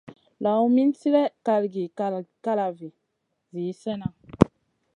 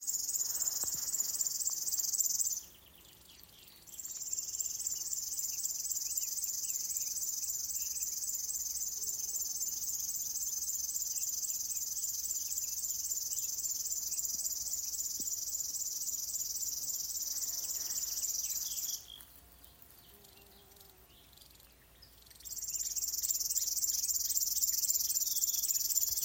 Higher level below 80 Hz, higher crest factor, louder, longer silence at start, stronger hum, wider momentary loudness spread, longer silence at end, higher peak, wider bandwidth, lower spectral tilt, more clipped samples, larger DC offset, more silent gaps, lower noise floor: first, -52 dBFS vs -68 dBFS; about the same, 24 dB vs 22 dB; first, -25 LUFS vs -33 LUFS; about the same, 0.1 s vs 0 s; neither; first, 13 LU vs 6 LU; first, 0.5 s vs 0 s; first, 0 dBFS vs -14 dBFS; second, 10.5 kHz vs 17 kHz; first, -8.5 dB/octave vs 2 dB/octave; neither; neither; neither; first, -77 dBFS vs -60 dBFS